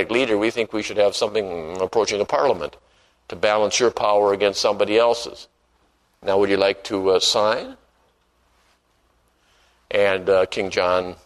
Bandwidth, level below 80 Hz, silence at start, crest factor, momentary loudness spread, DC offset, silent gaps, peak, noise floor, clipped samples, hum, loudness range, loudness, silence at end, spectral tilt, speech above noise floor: 12.5 kHz; -56 dBFS; 0 s; 20 dB; 9 LU; under 0.1%; none; -2 dBFS; -63 dBFS; under 0.1%; none; 4 LU; -20 LUFS; 0.1 s; -3 dB/octave; 43 dB